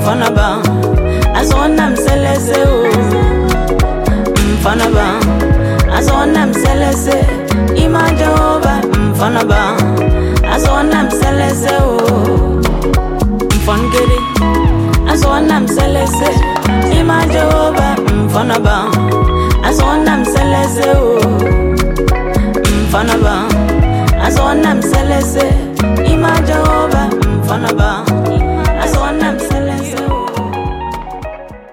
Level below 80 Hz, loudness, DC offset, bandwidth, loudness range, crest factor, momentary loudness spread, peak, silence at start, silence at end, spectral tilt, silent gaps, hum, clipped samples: -16 dBFS; -12 LUFS; under 0.1%; 17 kHz; 1 LU; 10 dB; 4 LU; 0 dBFS; 0 s; 0 s; -6 dB/octave; none; none; under 0.1%